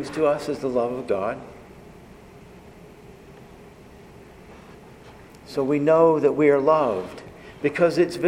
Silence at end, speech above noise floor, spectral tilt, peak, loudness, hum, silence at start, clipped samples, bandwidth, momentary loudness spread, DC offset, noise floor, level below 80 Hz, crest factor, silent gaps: 0 s; 25 dB; -6.5 dB/octave; -6 dBFS; -21 LUFS; none; 0 s; under 0.1%; 15 kHz; 19 LU; under 0.1%; -46 dBFS; -56 dBFS; 18 dB; none